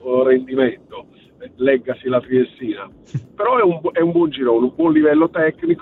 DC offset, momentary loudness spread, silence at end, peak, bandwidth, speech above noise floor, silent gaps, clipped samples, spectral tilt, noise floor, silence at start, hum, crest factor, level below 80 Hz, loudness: under 0.1%; 15 LU; 0.05 s; -2 dBFS; 4.1 kHz; 24 dB; none; under 0.1%; -9 dB/octave; -41 dBFS; 0.05 s; none; 16 dB; -58 dBFS; -17 LUFS